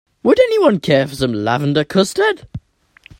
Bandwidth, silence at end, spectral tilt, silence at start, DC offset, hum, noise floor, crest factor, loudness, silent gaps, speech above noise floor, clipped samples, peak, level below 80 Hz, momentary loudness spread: 16.5 kHz; 0.6 s; -5.5 dB/octave; 0.25 s; under 0.1%; none; -49 dBFS; 16 dB; -15 LUFS; none; 35 dB; under 0.1%; 0 dBFS; -48 dBFS; 11 LU